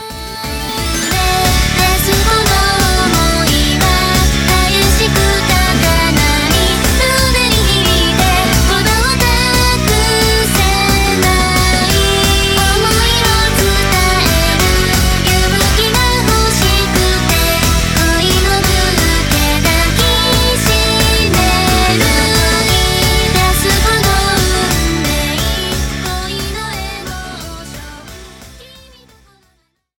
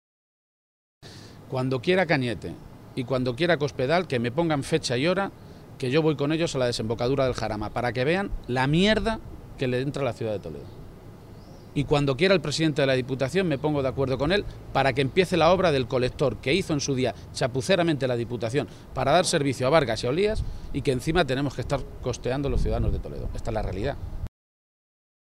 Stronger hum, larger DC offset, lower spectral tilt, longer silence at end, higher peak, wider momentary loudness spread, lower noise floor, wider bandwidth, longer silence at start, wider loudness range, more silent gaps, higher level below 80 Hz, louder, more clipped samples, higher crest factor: neither; neither; second, -3.5 dB/octave vs -5.5 dB/octave; first, 1.35 s vs 1 s; first, 0 dBFS vs -6 dBFS; second, 7 LU vs 12 LU; first, -60 dBFS vs -44 dBFS; first, over 20 kHz vs 15.5 kHz; second, 0 s vs 1 s; about the same, 5 LU vs 5 LU; neither; first, -18 dBFS vs -40 dBFS; first, -11 LUFS vs -25 LUFS; neither; second, 12 dB vs 20 dB